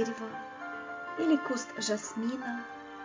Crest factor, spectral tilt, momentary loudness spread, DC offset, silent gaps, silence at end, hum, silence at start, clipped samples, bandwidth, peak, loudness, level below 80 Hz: 18 dB; -3.5 dB/octave; 12 LU; under 0.1%; none; 0 s; none; 0 s; under 0.1%; 7.6 kHz; -16 dBFS; -34 LUFS; -76 dBFS